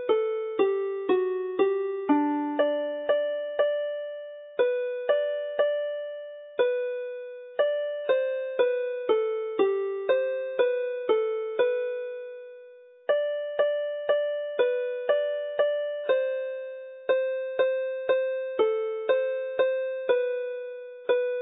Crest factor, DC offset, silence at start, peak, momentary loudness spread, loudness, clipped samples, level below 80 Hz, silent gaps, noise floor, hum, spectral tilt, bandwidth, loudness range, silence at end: 16 dB; under 0.1%; 0 s; -10 dBFS; 9 LU; -27 LUFS; under 0.1%; -82 dBFS; none; -50 dBFS; none; -7.5 dB/octave; 4 kHz; 2 LU; 0 s